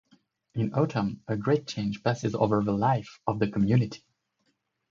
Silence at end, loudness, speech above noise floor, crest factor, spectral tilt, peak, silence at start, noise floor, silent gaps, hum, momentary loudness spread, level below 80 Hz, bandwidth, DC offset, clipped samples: 0.95 s; -28 LUFS; 49 dB; 18 dB; -7.5 dB/octave; -10 dBFS; 0.55 s; -75 dBFS; none; none; 8 LU; -58 dBFS; 7.4 kHz; under 0.1%; under 0.1%